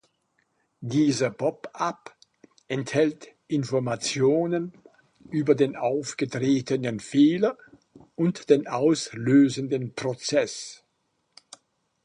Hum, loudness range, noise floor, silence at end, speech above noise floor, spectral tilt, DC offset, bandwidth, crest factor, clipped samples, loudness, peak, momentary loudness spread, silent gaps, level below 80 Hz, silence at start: none; 4 LU; -74 dBFS; 1.3 s; 50 dB; -5.5 dB/octave; under 0.1%; 10.5 kHz; 20 dB; under 0.1%; -25 LUFS; -6 dBFS; 11 LU; none; -68 dBFS; 0.8 s